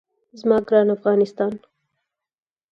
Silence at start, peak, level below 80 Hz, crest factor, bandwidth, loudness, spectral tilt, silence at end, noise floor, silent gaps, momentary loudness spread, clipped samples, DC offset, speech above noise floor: 0.35 s; -4 dBFS; -64 dBFS; 18 dB; 6.8 kHz; -20 LUFS; -8 dB/octave; 1.15 s; under -90 dBFS; none; 9 LU; under 0.1%; under 0.1%; over 71 dB